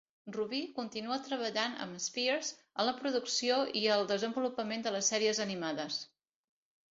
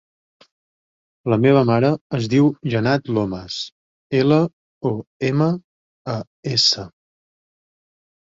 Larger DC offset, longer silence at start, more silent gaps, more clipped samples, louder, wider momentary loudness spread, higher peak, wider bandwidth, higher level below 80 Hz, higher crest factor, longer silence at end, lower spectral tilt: neither; second, 0.25 s vs 1.25 s; second, none vs 2.01-2.10 s, 3.72-4.10 s, 4.53-4.81 s, 5.07-5.20 s, 5.64-6.05 s, 6.27-6.43 s; neither; second, -34 LUFS vs -19 LUFS; second, 9 LU vs 13 LU; second, -16 dBFS vs -2 dBFS; about the same, 7.6 kHz vs 7.8 kHz; second, -80 dBFS vs -56 dBFS; about the same, 20 dB vs 18 dB; second, 0.85 s vs 1.4 s; second, -1.5 dB/octave vs -6 dB/octave